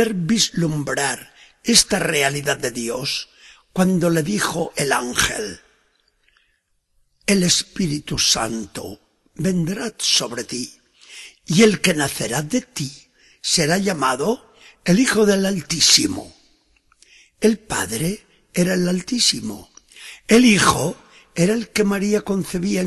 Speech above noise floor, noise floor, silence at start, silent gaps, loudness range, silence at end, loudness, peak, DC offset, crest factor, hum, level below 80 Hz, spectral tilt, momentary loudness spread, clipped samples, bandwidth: 48 dB; -67 dBFS; 0 s; none; 4 LU; 0 s; -19 LUFS; 0 dBFS; under 0.1%; 20 dB; none; -48 dBFS; -3.5 dB/octave; 16 LU; under 0.1%; 13 kHz